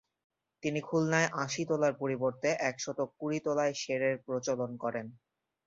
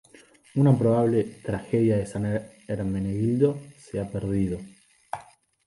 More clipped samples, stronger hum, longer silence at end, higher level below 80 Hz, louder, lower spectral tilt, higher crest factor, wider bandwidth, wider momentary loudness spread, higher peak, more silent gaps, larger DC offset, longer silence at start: neither; neither; about the same, 0.5 s vs 0.45 s; second, -74 dBFS vs -50 dBFS; second, -32 LUFS vs -25 LUFS; second, -4.5 dB/octave vs -9 dB/octave; about the same, 20 dB vs 18 dB; second, 7.8 kHz vs 11.5 kHz; second, 7 LU vs 16 LU; second, -12 dBFS vs -8 dBFS; neither; neither; about the same, 0.65 s vs 0.55 s